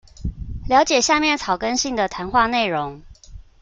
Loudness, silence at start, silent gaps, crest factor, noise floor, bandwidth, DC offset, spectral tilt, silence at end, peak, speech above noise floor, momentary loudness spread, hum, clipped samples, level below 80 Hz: -19 LUFS; 0.2 s; none; 18 dB; -41 dBFS; 9.6 kHz; under 0.1%; -3 dB/octave; 0.2 s; -2 dBFS; 22 dB; 16 LU; none; under 0.1%; -38 dBFS